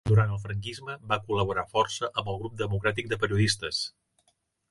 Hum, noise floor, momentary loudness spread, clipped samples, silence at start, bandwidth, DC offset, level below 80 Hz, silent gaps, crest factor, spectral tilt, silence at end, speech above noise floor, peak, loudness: none; -72 dBFS; 10 LU; under 0.1%; 0.05 s; 11.5 kHz; under 0.1%; -50 dBFS; none; 18 dB; -5 dB/octave; 0.8 s; 44 dB; -10 dBFS; -29 LUFS